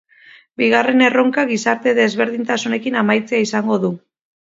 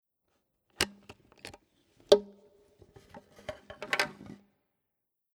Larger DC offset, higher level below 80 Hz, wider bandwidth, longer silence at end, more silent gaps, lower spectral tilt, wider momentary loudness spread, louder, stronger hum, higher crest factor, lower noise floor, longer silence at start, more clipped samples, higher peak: neither; about the same, -66 dBFS vs -66 dBFS; second, 7.8 kHz vs 19.5 kHz; second, 0.55 s vs 1.1 s; neither; first, -4.5 dB/octave vs -2.5 dB/octave; second, 7 LU vs 28 LU; first, -16 LUFS vs -30 LUFS; neither; second, 18 dB vs 30 dB; second, -47 dBFS vs -85 dBFS; second, 0.6 s vs 0.8 s; neither; first, 0 dBFS vs -4 dBFS